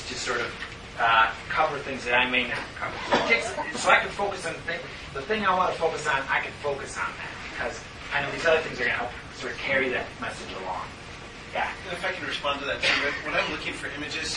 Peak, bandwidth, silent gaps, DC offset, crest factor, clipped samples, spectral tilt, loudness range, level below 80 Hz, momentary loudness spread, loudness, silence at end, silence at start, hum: -4 dBFS; 11.5 kHz; none; under 0.1%; 24 dB; under 0.1%; -3 dB/octave; 5 LU; -50 dBFS; 13 LU; -26 LUFS; 0 s; 0 s; none